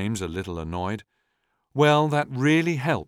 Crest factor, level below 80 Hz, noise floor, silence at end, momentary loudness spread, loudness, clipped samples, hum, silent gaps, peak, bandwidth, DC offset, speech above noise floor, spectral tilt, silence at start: 18 dB; -50 dBFS; -74 dBFS; 0.05 s; 12 LU; -23 LUFS; under 0.1%; none; none; -6 dBFS; 15 kHz; under 0.1%; 51 dB; -6 dB/octave; 0 s